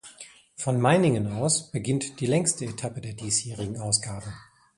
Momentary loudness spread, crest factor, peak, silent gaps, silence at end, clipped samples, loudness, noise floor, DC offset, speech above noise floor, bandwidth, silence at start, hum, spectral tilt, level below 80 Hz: 19 LU; 20 dB; -6 dBFS; none; 0.35 s; under 0.1%; -26 LUFS; -49 dBFS; under 0.1%; 23 dB; 11.5 kHz; 0.05 s; none; -4.5 dB/octave; -56 dBFS